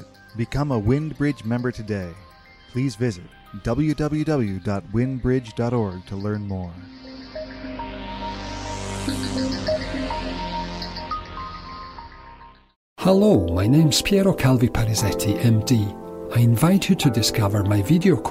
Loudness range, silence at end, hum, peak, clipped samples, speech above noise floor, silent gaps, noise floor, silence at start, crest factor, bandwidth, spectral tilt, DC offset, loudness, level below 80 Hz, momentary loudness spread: 10 LU; 0 s; none; -6 dBFS; under 0.1%; 25 dB; 12.76-12.96 s; -45 dBFS; 0 s; 16 dB; 16 kHz; -6 dB/octave; under 0.1%; -22 LUFS; -40 dBFS; 17 LU